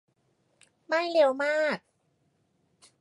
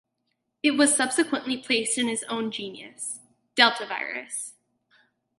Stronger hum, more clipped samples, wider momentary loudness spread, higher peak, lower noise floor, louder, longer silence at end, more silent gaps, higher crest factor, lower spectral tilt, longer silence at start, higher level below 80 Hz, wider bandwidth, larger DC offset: neither; neither; second, 7 LU vs 14 LU; second, -12 dBFS vs -2 dBFS; second, -72 dBFS vs -78 dBFS; about the same, -26 LUFS vs -25 LUFS; first, 1.25 s vs 0.9 s; neither; second, 20 dB vs 26 dB; first, -4 dB/octave vs -1 dB/octave; first, 0.9 s vs 0.65 s; second, -86 dBFS vs -78 dBFS; about the same, 11.5 kHz vs 12 kHz; neither